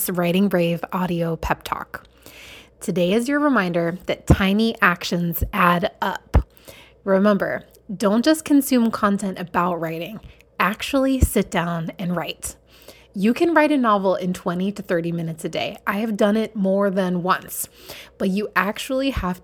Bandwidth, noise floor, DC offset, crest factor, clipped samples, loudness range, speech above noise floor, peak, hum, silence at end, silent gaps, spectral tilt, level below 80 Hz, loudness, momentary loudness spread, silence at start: 19 kHz; -47 dBFS; under 0.1%; 20 dB; under 0.1%; 3 LU; 27 dB; 0 dBFS; none; 0.05 s; none; -5.5 dB/octave; -34 dBFS; -21 LUFS; 13 LU; 0 s